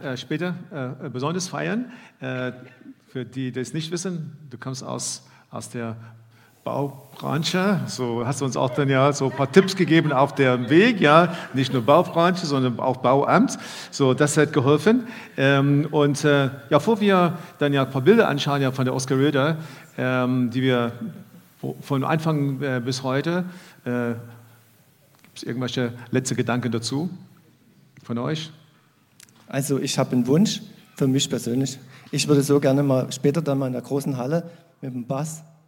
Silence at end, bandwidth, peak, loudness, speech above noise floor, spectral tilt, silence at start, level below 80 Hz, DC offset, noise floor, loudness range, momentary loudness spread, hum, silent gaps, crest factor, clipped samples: 0.25 s; 17 kHz; 0 dBFS; -22 LUFS; 37 dB; -5.5 dB/octave; 0 s; -70 dBFS; under 0.1%; -59 dBFS; 12 LU; 16 LU; none; none; 22 dB; under 0.1%